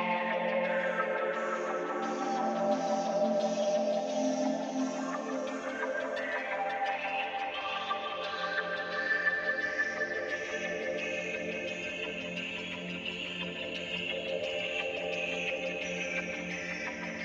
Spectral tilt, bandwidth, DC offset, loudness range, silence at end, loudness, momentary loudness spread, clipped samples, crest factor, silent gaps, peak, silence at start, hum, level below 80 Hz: -4 dB/octave; 8.4 kHz; under 0.1%; 4 LU; 0 s; -33 LUFS; 6 LU; under 0.1%; 16 dB; none; -18 dBFS; 0 s; none; -70 dBFS